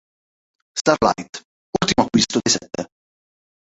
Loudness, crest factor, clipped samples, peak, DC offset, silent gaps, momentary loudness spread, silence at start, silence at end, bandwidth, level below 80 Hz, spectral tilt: -19 LUFS; 20 dB; under 0.1%; -2 dBFS; under 0.1%; 0.81-0.85 s, 1.29-1.33 s, 1.45-1.73 s; 16 LU; 0.75 s; 0.85 s; 8.2 kHz; -48 dBFS; -3.5 dB/octave